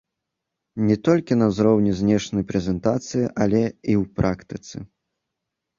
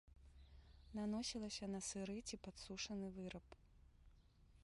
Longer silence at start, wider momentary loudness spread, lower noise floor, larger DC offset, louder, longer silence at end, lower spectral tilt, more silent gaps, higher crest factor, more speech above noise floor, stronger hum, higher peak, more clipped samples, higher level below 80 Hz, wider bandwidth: first, 0.75 s vs 0.05 s; second, 15 LU vs 22 LU; first, -82 dBFS vs -69 dBFS; neither; first, -21 LUFS vs -48 LUFS; first, 0.95 s vs 0 s; first, -7 dB/octave vs -4 dB/octave; neither; about the same, 18 dB vs 16 dB; first, 61 dB vs 21 dB; neither; first, -4 dBFS vs -34 dBFS; neither; first, -46 dBFS vs -66 dBFS; second, 7.6 kHz vs 11.5 kHz